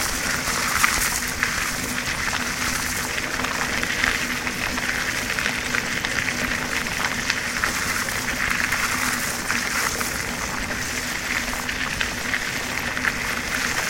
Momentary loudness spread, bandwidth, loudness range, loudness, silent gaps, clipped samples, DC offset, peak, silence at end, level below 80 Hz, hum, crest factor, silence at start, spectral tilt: 4 LU; 16.5 kHz; 2 LU; -23 LUFS; none; under 0.1%; under 0.1%; 0 dBFS; 0 s; -40 dBFS; none; 24 dB; 0 s; -1.5 dB/octave